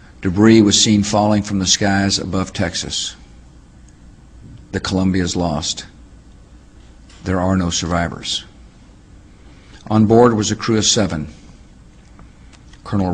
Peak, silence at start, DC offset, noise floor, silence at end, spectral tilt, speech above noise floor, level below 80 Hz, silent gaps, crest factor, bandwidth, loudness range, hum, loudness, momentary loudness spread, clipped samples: 0 dBFS; 0.2 s; under 0.1%; -43 dBFS; 0 s; -4 dB/octave; 28 dB; -40 dBFS; none; 18 dB; 10 kHz; 8 LU; none; -16 LUFS; 13 LU; under 0.1%